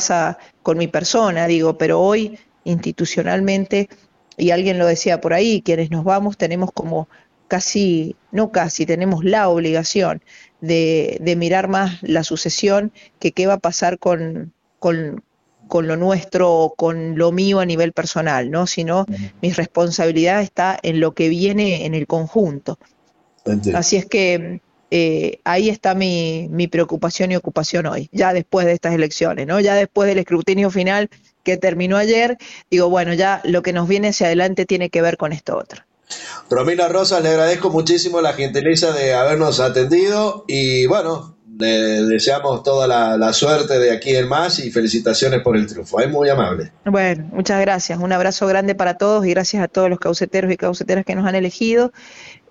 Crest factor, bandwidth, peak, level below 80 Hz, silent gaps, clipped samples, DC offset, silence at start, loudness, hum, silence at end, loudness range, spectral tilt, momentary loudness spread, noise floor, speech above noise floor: 12 dB; 8.8 kHz; -4 dBFS; -52 dBFS; none; under 0.1%; under 0.1%; 0 s; -17 LUFS; none; 0.15 s; 3 LU; -5 dB/octave; 7 LU; -58 dBFS; 41 dB